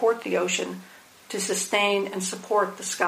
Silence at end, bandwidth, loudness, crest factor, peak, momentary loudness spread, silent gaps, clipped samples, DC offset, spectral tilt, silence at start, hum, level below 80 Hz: 0 s; 15.5 kHz; -25 LUFS; 20 dB; -6 dBFS; 10 LU; none; under 0.1%; under 0.1%; -2.5 dB/octave; 0 s; none; -80 dBFS